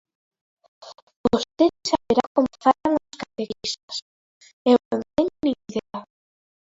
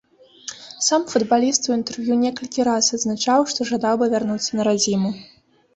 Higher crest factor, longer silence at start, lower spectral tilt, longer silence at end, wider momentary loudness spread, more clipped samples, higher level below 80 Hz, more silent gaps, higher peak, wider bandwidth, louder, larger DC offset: about the same, 20 dB vs 18 dB; first, 0.8 s vs 0.45 s; about the same, -4.5 dB/octave vs -3.5 dB/octave; first, 0.65 s vs 0.5 s; first, 13 LU vs 9 LU; neither; first, -56 dBFS vs -62 dBFS; first, 1.02-1.07 s, 1.16-1.24 s, 2.27-2.35 s, 3.83-3.88 s, 4.02-4.41 s, 4.53-4.65 s, 4.85-4.91 s vs none; about the same, -4 dBFS vs -2 dBFS; about the same, 8 kHz vs 8.4 kHz; second, -23 LUFS vs -20 LUFS; neither